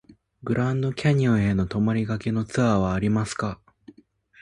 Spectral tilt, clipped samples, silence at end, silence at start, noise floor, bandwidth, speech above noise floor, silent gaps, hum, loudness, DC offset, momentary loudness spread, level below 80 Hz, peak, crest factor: -7 dB/octave; under 0.1%; 0.85 s; 0.45 s; -56 dBFS; 11 kHz; 33 dB; none; none; -24 LUFS; under 0.1%; 8 LU; -46 dBFS; -8 dBFS; 16 dB